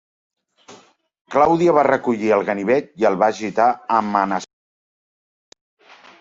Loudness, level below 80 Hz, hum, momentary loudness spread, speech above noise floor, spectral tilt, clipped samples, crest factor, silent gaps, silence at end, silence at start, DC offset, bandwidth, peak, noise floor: -18 LUFS; -60 dBFS; none; 7 LU; 32 dB; -6 dB/octave; under 0.1%; 18 dB; 1.21-1.25 s; 1.75 s; 0.7 s; under 0.1%; 7.8 kHz; -2 dBFS; -50 dBFS